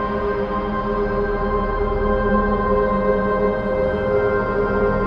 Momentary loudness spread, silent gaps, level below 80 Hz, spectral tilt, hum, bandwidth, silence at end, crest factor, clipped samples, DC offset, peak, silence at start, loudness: 3 LU; none; -30 dBFS; -9 dB/octave; none; 5.6 kHz; 0 s; 12 dB; under 0.1%; under 0.1%; -6 dBFS; 0 s; -20 LUFS